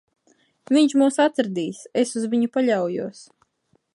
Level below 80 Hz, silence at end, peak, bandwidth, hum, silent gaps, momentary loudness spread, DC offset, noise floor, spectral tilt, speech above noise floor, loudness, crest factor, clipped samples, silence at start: -76 dBFS; 0.7 s; -6 dBFS; 11.5 kHz; none; none; 10 LU; under 0.1%; -67 dBFS; -5 dB/octave; 46 dB; -21 LUFS; 16 dB; under 0.1%; 0.7 s